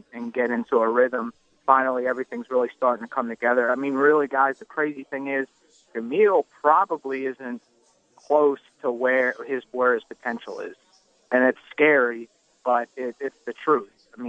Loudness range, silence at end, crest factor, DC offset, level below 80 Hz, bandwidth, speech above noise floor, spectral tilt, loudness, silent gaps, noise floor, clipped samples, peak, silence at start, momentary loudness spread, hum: 2 LU; 0 s; 22 dB; under 0.1%; -78 dBFS; 8 kHz; 36 dB; -6 dB/octave; -23 LUFS; none; -59 dBFS; under 0.1%; -2 dBFS; 0.15 s; 13 LU; none